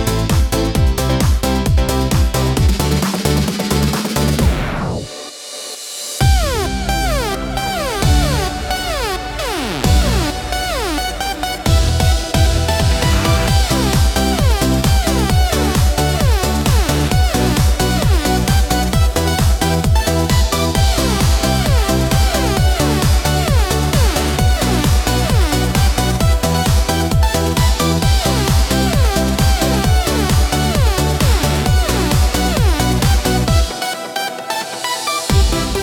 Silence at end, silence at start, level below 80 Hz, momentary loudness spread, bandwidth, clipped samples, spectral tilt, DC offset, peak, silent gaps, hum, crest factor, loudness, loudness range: 0 s; 0 s; -18 dBFS; 5 LU; 17.5 kHz; under 0.1%; -4.5 dB/octave; under 0.1%; 0 dBFS; none; none; 14 dB; -15 LUFS; 3 LU